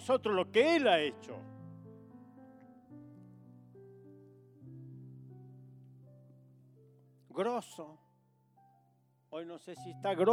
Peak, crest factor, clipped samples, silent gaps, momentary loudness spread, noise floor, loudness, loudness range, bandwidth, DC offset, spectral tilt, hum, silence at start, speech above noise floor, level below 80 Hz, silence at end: -14 dBFS; 22 dB; under 0.1%; none; 29 LU; -71 dBFS; -32 LUFS; 21 LU; 15 kHz; under 0.1%; -5 dB/octave; none; 0 s; 39 dB; -86 dBFS; 0 s